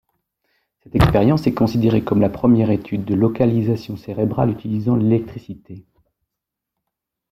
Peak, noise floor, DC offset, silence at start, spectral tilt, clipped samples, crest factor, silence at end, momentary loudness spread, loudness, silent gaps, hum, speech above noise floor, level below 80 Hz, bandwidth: -2 dBFS; -83 dBFS; under 0.1%; 0.95 s; -9 dB/octave; under 0.1%; 18 dB; 1.5 s; 10 LU; -18 LUFS; none; none; 65 dB; -38 dBFS; 14.5 kHz